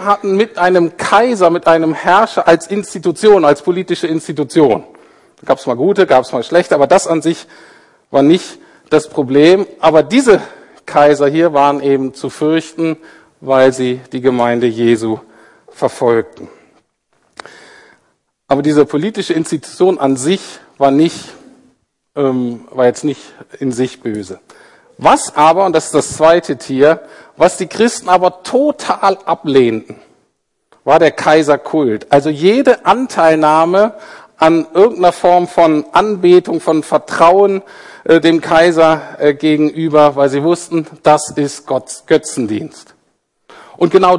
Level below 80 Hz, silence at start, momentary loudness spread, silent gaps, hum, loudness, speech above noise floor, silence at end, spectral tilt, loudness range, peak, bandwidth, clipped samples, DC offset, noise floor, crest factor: -52 dBFS; 0 s; 10 LU; none; none; -12 LUFS; 52 dB; 0 s; -5 dB/octave; 6 LU; 0 dBFS; 11.5 kHz; 0.2%; under 0.1%; -64 dBFS; 12 dB